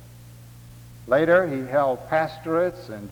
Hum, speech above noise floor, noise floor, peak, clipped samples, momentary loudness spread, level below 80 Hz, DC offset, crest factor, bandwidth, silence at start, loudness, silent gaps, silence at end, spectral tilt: none; 22 dB; -45 dBFS; -6 dBFS; under 0.1%; 9 LU; -54 dBFS; under 0.1%; 18 dB; over 20 kHz; 0 s; -22 LUFS; none; 0 s; -7 dB/octave